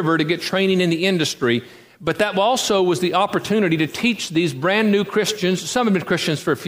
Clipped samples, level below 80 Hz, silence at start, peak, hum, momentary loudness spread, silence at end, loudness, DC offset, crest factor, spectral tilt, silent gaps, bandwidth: under 0.1%; -58 dBFS; 0 s; -4 dBFS; none; 3 LU; 0 s; -19 LUFS; under 0.1%; 16 dB; -4.5 dB/octave; none; 15.5 kHz